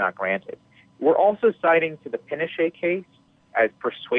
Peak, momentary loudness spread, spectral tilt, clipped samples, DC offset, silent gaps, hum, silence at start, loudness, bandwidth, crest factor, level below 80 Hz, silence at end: -8 dBFS; 12 LU; -8 dB/octave; under 0.1%; under 0.1%; none; none; 0 s; -23 LUFS; 4 kHz; 16 dB; -74 dBFS; 0 s